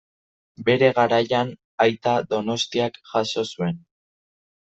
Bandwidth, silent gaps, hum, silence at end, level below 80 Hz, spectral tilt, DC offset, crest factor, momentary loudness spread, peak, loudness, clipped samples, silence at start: 8.2 kHz; 1.64-1.78 s; none; 0.9 s; -64 dBFS; -5 dB/octave; under 0.1%; 20 dB; 10 LU; -4 dBFS; -22 LUFS; under 0.1%; 0.6 s